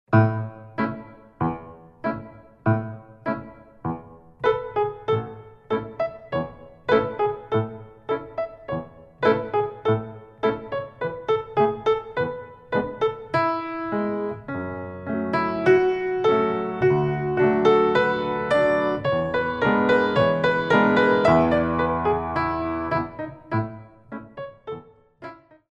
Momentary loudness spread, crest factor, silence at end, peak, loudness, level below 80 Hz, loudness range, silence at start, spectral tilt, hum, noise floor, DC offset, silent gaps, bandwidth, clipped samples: 17 LU; 18 dB; 0.35 s; -4 dBFS; -23 LUFS; -50 dBFS; 8 LU; 0.1 s; -8 dB/octave; none; -45 dBFS; under 0.1%; none; 8.6 kHz; under 0.1%